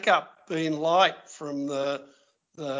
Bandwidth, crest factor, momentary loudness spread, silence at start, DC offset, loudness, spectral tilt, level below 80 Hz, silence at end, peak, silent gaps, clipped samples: 7.6 kHz; 22 dB; 15 LU; 0 s; under 0.1%; -27 LUFS; -4 dB/octave; -78 dBFS; 0 s; -6 dBFS; none; under 0.1%